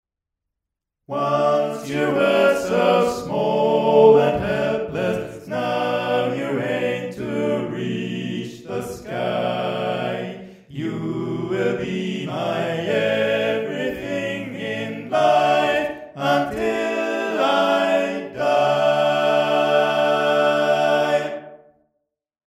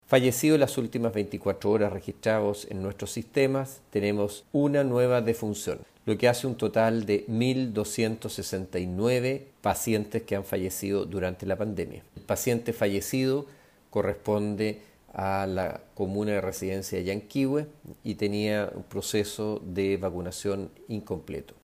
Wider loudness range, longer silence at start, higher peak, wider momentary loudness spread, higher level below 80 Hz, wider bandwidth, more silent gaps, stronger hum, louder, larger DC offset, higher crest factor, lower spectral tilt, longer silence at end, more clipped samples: first, 8 LU vs 4 LU; first, 1.1 s vs 0.1 s; first, -2 dBFS vs -8 dBFS; about the same, 11 LU vs 10 LU; about the same, -56 dBFS vs -60 dBFS; about the same, 15 kHz vs 16 kHz; neither; neither; first, -21 LUFS vs -28 LUFS; neither; about the same, 18 dB vs 20 dB; about the same, -5.5 dB/octave vs -5.5 dB/octave; first, 0.95 s vs 0.2 s; neither